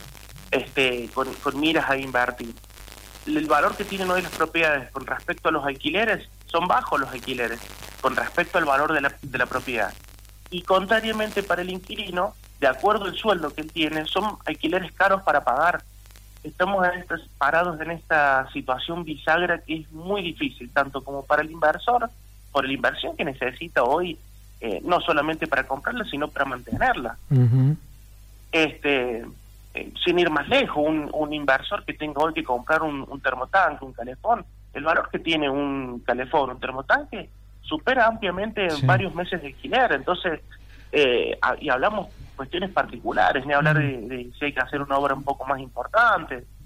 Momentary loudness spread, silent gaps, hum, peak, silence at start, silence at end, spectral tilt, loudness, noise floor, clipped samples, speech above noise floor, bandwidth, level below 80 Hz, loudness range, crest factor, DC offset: 11 LU; none; none; -8 dBFS; 0 s; 0 s; -5.5 dB/octave; -24 LUFS; -46 dBFS; under 0.1%; 23 dB; 16.5 kHz; -46 dBFS; 2 LU; 16 dB; under 0.1%